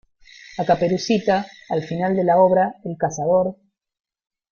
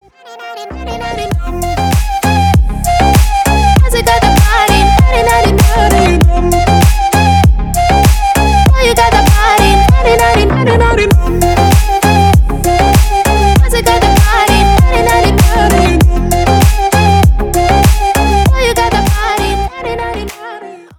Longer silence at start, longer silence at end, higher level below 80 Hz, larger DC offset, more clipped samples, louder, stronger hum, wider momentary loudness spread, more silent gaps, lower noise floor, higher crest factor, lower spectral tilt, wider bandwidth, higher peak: first, 0.5 s vs 0.25 s; first, 1 s vs 0.2 s; second, -58 dBFS vs -12 dBFS; neither; second, under 0.1% vs 1%; second, -20 LUFS vs -9 LUFS; neither; about the same, 11 LU vs 9 LU; neither; first, -46 dBFS vs -30 dBFS; first, 16 dB vs 8 dB; about the same, -6 dB/octave vs -5 dB/octave; second, 7.2 kHz vs 19 kHz; second, -4 dBFS vs 0 dBFS